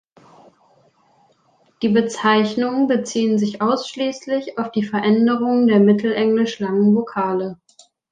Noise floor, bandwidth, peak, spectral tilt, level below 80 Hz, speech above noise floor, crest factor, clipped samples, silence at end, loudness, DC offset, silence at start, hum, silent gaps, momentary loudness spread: -59 dBFS; 9.2 kHz; -2 dBFS; -6 dB/octave; -66 dBFS; 42 dB; 16 dB; under 0.1%; 0.55 s; -18 LUFS; under 0.1%; 1.8 s; none; none; 9 LU